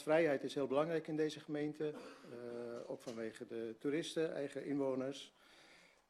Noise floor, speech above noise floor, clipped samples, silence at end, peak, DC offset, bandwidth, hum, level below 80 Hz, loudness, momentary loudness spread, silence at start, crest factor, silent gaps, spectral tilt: -66 dBFS; 25 dB; under 0.1%; 0.3 s; -22 dBFS; under 0.1%; 13 kHz; none; -86 dBFS; -41 LUFS; 12 LU; 0 s; 18 dB; none; -5.5 dB/octave